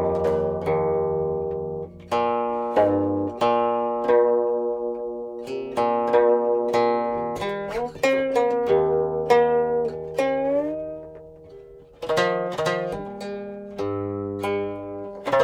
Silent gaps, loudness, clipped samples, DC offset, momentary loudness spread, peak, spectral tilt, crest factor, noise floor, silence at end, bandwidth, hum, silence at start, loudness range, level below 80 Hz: none; -23 LUFS; under 0.1%; under 0.1%; 13 LU; -6 dBFS; -6 dB/octave; 18 dB; -45 dBFS; 0 s; 13 kHz; none; 0 s; 5 LU; -54 dBFS